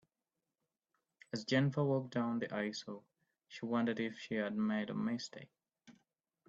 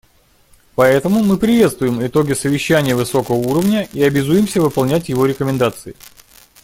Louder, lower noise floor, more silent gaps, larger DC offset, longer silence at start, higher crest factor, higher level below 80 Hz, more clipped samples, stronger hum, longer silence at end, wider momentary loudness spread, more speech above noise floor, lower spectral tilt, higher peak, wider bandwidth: second, -38 LUFS vs -15 LUFS; first, under -90 dBFS vs -52 dBFS; neither; neither; first, 1.35 s vs 0.8 s; about the same, 18 dB vs 14 dB; second, -80 dBFS vs -46 dBFS; neither; neither; about the same, 0.55 s vs 0.55 s; first, 14 LU vs 5 LU; first, over 53 dB vs 38 dB; about the same, -6 dB/octave vs -6 dB/octave; second, -20 dBFS vs 0 dBFS; second, 7.8 kHz vs 17 kHz